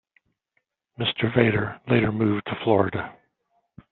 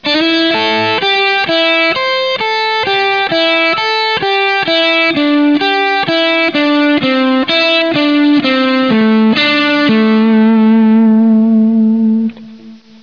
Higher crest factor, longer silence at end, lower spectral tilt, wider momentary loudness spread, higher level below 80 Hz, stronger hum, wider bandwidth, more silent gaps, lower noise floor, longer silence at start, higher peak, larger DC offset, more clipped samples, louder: first, 22 dB vs 8 dB; first, 0.8 s vs 0.25 s; about the same, -5 dB/octave vs -5.5 dB/octave; first, 7 LU vs 3 LU; about the same, -56 dBFS vs -56 dBFS; neither; second, 4.3 kHz vs 5.4 kHz; neither; first, -75 dBFS vs -35 dBFS; first, 1 s vs 0 s; about the same, -2 dBFS vs -2 dBFS; second, under 0.1% vs 0.4%; neither; second, -23 LUFS vs -10 LUFS